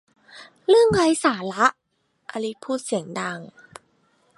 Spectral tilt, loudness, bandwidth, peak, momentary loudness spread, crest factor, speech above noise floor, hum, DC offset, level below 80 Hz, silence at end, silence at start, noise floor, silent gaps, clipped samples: -4.5 dB/octave; -22 LUFS; 11.5 kHz; -2 dBFS; 15 LU; 20 dB; 43 dB; none; under 0.1%; -56 dBFS; 0.9 s; 0.35 s; -64 dBFS; none; under 0.1%